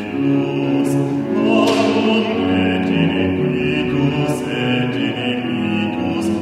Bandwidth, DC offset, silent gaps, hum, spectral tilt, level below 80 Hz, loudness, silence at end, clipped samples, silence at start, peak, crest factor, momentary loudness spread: 13 kHz; under 0.1%; none; none; -6.5 dB/octave; -48 dBFS; -17 LUFS; 0 s; under 0.1%; 0 s; -2 dBFS; 14 dB; 5 LU